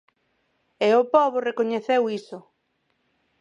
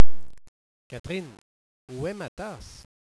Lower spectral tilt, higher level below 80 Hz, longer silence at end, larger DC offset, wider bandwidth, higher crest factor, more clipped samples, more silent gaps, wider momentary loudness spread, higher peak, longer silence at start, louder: about the same, -5.5 dB/octave vs -6 dB/octave; second, -76 dBFS vs -46 dBFS; first, 1 s vs 0.3 s; neither; second, 9.8 kHz vs 11 kHz; about the same, 20 dB vs 18 dB; neither; second, none vs 0.48-0.90 s, 1.00-1.04 s, 1.41-1.88 s, 2.28-2.37 s; about the same, 17 LU vs 19 LU; about the same, -4 dBFS vs -2 dBFS; first, 0.8 s vs 0 s; first, -22 LUFS vs -35 LUFS